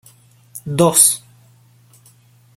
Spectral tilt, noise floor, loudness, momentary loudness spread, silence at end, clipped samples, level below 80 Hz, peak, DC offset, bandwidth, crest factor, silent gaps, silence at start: -3.5 dB/octave; -51 dBFS; -13 LUFS; 23 LU; 1.4 s; under 0.1%; -58 dBFS; 0 dBFS; under 0.1%; 17 kHz; 20 dB; none; 0.55 s